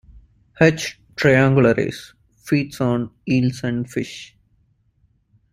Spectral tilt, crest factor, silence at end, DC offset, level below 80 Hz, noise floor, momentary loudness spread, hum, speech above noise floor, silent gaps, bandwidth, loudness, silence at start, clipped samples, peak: -6.5 dB/octave; 20 dB; 1.3 s; under 0.1%; -50 dBFS; -62 dBFS; 13 LU; none; 43 dB; none; 15 kHz; -19 LUFS; 0.6 s; under 0.1%; -2 dBFS